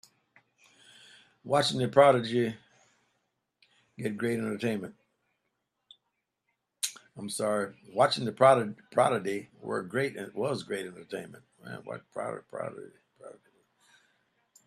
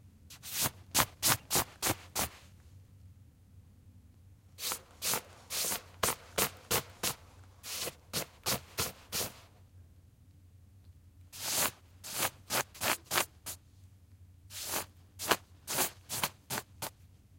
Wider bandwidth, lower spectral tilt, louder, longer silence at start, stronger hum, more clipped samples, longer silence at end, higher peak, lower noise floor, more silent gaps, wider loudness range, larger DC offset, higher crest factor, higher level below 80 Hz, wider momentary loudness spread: second, 14.5 kHz vs 16.5 kHz; first, -4.5 dB/octave vs -1.5 dB/octave; first, -29 LUFS vs -34 LUFS; first, 1.45 s vs 0.05 s; neither; neither; first, 1.35 s vs 0.25 s; about the same, -6 dBFS vs -4 dBFS; first, -82 dBFS vs -59 dBFS; neither; first, 11 LU vs 6 LU; neither; second, 24 dB vs 34 dB; second, -74 dBFS vs -62 dBFS; first, 19 LU vs 13 LU